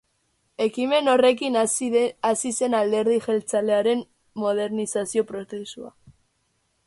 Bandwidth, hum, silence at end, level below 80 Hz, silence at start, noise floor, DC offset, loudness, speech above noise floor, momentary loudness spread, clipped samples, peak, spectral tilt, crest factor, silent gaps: 11.5 kHz; none; 0.75 s; -68 dBFS; 0.6 s; -70 dBFS; under 0.1%; -23 LUFS; 48 dB; 16 LU; under 0.1%; -8 dBFS; -3.5 dB/octave; 16 dB; none